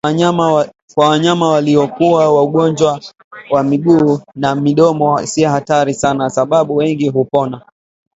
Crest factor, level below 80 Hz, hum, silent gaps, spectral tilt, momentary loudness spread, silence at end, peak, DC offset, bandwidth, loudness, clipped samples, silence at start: 12 dB; -52 dBFS; none; 0.82-0.88 s, 3.24-3.31 s; -6 dB/octave; 6 LU; 0.6 s; 0 dBFS; under 0.1%; 8 kHz; -13 LUFS; under 0.1%; 0.05 s